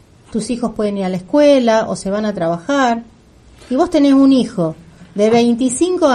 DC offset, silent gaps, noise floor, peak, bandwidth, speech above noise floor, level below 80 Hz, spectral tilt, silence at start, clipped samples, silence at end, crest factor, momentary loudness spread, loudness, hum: under 0.1%; none; -45 dBFS; -2 dBFS; 11 kHz; 31 dB; -48 dBFS; -5.5 dB/octave; 0.3 s; under 0.1%; 0 s; 14 dB; 11 LU; -15 LUFS; none